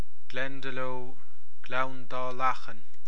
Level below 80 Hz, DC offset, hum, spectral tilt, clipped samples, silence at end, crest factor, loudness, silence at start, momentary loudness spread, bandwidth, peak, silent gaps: -72 dBFS; 10%; none; -5.5 dB/octave; under 0.1%; 0.1 s; 22 dB; -34 LUFS; 0.3 s; 16 LU; 11 kHz; -12 dBFS; none